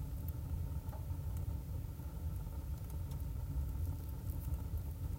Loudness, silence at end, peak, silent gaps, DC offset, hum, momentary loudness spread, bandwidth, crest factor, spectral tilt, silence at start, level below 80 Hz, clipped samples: -43 LUFS; 0 s; -28 dBFS; none; under 0.1%; none; 3 LU; 16 kHz; 12 dB; -7.5 dB/octave; 0 s; -44 dBFS; under 0.1%